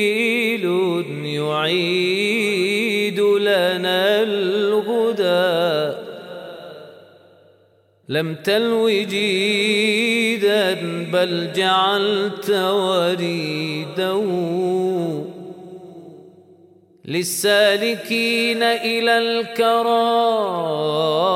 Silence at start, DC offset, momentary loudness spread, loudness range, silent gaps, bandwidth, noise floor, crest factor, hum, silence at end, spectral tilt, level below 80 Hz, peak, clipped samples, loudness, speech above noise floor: 0 s; under 0.1%; 9 LU; 6 LU; none; 16 kHz; -57 dBFS; 16 dB; none; 0 s; -4 dB/octave; -72 dBFS; -4 dBFS; under 0.1%; -19 LUFS; 38 dB